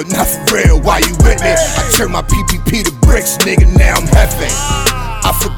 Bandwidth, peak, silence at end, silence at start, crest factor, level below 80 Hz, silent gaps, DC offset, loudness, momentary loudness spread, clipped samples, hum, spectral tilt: 19.5 kHz; 0 dBFS; 0 s; 0 s; 10 dB; -14 dBFS; none; under 0.1%; -11 LUFS; 5 LU; under 0.1%; none; -4 dB/octave